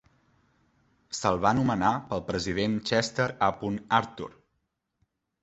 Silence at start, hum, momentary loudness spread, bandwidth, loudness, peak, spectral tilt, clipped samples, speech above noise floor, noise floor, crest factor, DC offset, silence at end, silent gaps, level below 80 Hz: 1.1 s; none; 12 LU; 8.2 kHz; -27 LUFS; -8 dBFS; -5 dB/octave; under 0.1%; 51 dB; -78 dBFS; 22 dB; under 0.1%; 1.1 s; none; -54 dBFS